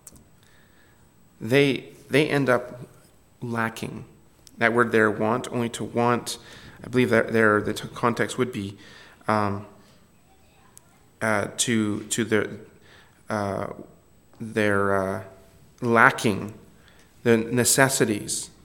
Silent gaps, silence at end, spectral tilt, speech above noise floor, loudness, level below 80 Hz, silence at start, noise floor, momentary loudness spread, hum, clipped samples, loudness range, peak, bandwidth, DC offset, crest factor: none; 0.15 s; -4 dB/octave; 33 dB; -23 LUFS; -60 dBFS; 0.15 s; -56 dBFS; 17 LU; none; under 0.1%; 6 LU; 0 dBFS; 17.5 kHz; under 0.1%; 26 dB